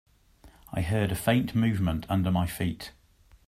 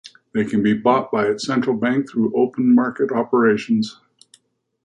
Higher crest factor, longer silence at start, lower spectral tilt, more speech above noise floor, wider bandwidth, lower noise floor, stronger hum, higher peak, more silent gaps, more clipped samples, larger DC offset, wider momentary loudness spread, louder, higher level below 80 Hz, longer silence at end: about the same, 18 dB vs 14 dB; about the same, 0.45 s vs 0.35 s; about the same, -6.5 dB/octave vs -6.5 dB/octave; second, 30 dB vs 39 dB; first, 15.5 kHz vs 9.8 kHz; about the same, -56 dBFS vs -57 dBFS; neither; second, -10 dBFS vs -4 dBFS; neither; neither; neither; first, 10 LU vs 5 LU; second, -28 LUFS vs -19 LUFS; first, -48 dBFS vs -62 dBFS; second, 0.6 s vs 0.95 s